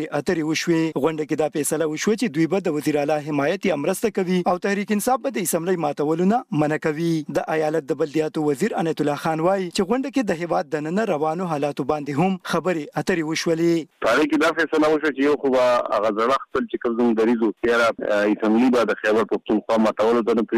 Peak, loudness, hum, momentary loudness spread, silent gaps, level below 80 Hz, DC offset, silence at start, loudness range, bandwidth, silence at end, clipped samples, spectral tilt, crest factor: -8 dBFS; -21 LUFS; none; 5 LU; none; -58 dBFS; under 0.1%; 0 s; 3 LU; 15.5 kHz; 0 s; under 0.1%; -5.5 dB/octave; 14 dB